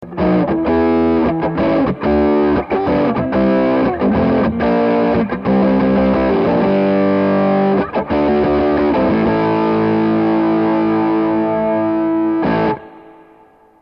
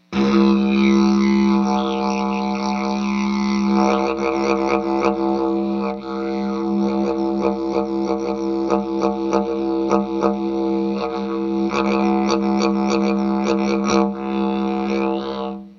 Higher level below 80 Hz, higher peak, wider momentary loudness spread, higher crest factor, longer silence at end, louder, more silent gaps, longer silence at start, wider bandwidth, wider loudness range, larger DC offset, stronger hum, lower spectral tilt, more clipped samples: first, -36 dBFS vs -46 dBFS; about the same, -4 dBFS vs -2 dBFS; second, 3 LU vs 7 LU; second, 10 dB vs 16 dB; first, 0.8 s vs 0.05 s; first, -15 LUFS vs -20 LUFS; neither; about the same, 0 s vs 0.1 s; second, 5.6 kHz vs 7 kHz; about the same, 1 LU vs 3 LU; neither; neither; first, -10 dB/octave vs -6.5 dB/octave; neither